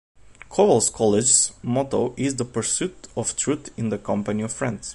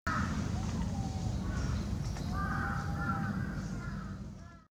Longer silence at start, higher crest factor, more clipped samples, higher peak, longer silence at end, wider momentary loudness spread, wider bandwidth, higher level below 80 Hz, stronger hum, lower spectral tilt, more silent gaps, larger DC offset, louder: first, 0.3 s vs 0.05 s; first, 20 dB vs 14 dB; neither; first, -4 dBFS vs -20 dBFS; about the same, 0 s vs 0.1 s; first, 11 LU vs 7 LU; second, 11.5 kHz vs 14.5 kHz; second, -52 dBFS vs -42 dBFS; neither; second, -4 dB/octave vs -6 dB/octave; neither; neither; first, -22 LUFS vs -36 LUFS